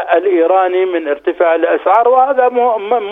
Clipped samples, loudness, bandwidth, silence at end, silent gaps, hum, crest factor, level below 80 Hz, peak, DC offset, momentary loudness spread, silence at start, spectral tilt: under 0.1%; -12 LUFS; 3.9 kHz; 0 s; none; none; 12 dB; -60 dBFS; 0 dBFS; under 0.1%; 6 LU; 0 s; -6 dB/octave